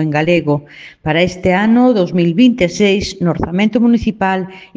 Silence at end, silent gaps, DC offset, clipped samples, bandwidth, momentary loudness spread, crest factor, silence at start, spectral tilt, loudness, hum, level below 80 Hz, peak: 0.1 s; none; under 0.1%; under 0.1%; 7.8 kHz; 6 LU; 14 dB; 0 s; -6.5 dB/octave; -13 LUFS; none; -38 dBFS; 0 dBFS